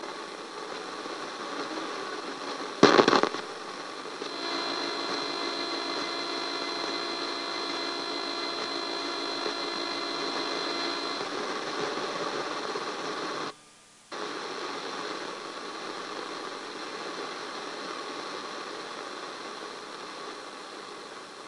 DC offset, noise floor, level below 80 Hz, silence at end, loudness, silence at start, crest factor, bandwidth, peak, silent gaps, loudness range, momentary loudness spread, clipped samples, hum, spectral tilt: under 0.1%; -55 dBFS; -78 dBFS; 0 s; -32 LUFS; 0 s; 30 dB; 11.5 kHz; -2 dBFS; none; 10 LU; 9 LU; under 0.1%; none; -3 dB/octave